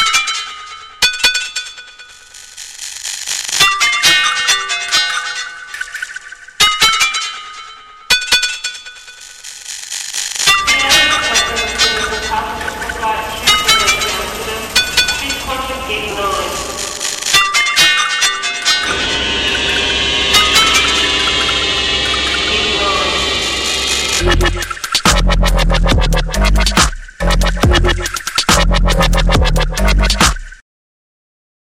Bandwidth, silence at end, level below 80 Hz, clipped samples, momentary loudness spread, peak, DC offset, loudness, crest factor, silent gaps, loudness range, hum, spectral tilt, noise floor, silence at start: 16.5 kHz; 1.05 s; -22 dBFS; under 0.1%; 15 LU; 0 dBFS; under 0.1%; -12 LUFS; 14 dB; none; 4 LU; none; -2 dB/octave; -37 dBFS; 0 s